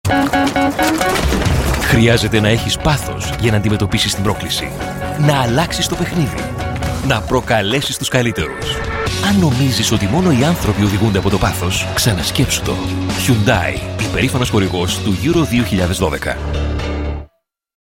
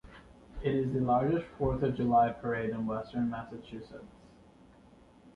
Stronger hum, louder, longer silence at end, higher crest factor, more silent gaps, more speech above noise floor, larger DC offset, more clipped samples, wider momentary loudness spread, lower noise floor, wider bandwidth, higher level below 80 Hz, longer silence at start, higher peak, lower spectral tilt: neither; first, -16 LUFS vs -31 LUFS; first, 0.75 s vs 0.05 s; about the same, 16 dB vs 18 dB; neither; first, 40 dB vs 27 dB; neither; neither; second, 7 LU vs 19 LU; about the same, -55 dBFS vs -58 dBFS; first, 17 kHz vs 6.8 kHz; first, -28 dBFS vs -52 dBFS; about the same, 0.05 s vs 0.05 s; first, 0 dBFS vs -16 dBFS; second, -5 dB/octave vs -9.5 dB/octave